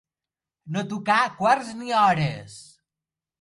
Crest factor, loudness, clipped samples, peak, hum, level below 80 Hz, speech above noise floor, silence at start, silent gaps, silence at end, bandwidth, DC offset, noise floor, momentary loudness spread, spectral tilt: 18 dB; -23 LUFS; under 0.1%; -8 dBFS; none; -62 dBFS; over 67 dB; 0.65 s; none; 0.8 s; 11.5 kHz; under 0.1%; under -90 dBFS; 12 LU; -5 dB/octave